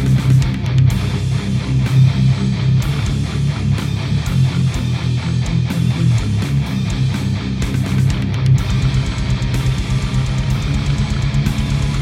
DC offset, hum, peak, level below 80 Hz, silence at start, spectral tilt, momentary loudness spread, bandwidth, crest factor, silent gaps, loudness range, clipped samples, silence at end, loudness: under 0.1%; none; -2 dBFS; -26 dBFS; 0 s; -6.5 dB/octave; 5 LU; 12 kHz; 14 dB; none; 2 LU; under 0.1%; 0 s; -17 LUFS